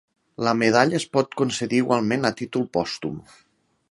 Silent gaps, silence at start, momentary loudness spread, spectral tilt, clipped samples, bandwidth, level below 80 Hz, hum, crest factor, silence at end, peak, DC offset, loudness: none; 0.4 s; 10 LU; -5 dB/octave; under 0.1%; 11.5 kHz; -60 dBFS; none; 22 dB; 0.7 s; 0 dBFS; under 0.1%; -23 LUFS